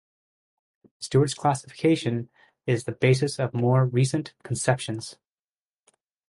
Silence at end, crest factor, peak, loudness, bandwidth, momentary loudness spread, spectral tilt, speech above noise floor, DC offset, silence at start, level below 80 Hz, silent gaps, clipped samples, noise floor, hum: 1.15 s; 18 dB; -8 dBFS; -25 LUFS; 11.5 kHz; 13 LU; -6 dB/octave; over 66 dB; under 0.1%; 1 s; -62 dBFS; none; under 0.1%; under -90 dBFS; none